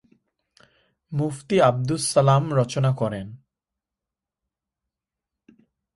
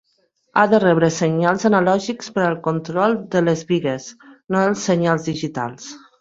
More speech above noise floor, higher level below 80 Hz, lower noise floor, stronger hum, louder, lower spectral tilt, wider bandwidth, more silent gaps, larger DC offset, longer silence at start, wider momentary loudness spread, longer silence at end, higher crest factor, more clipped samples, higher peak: first, 67 dB vs 47 dB; about the same, -60 dBFS vs -58 dBFS; first, -88 dBFS vs -65 dBFS; neither; second, -22 LUFS vs -19 LUFS; about the same, -6 dB/octave vs -6 dB/octave; first, 11.5 kHz vs 7.8 kHz; neither; neither; first, 1.1 s vs 0.55 s; about the same, 12 LU vs 11 LU; first, 2.6 s vs 0.25 s; about the same, 20 dB vs 18 dB; neither; about the same, -4 dBFS vs -2 dBFS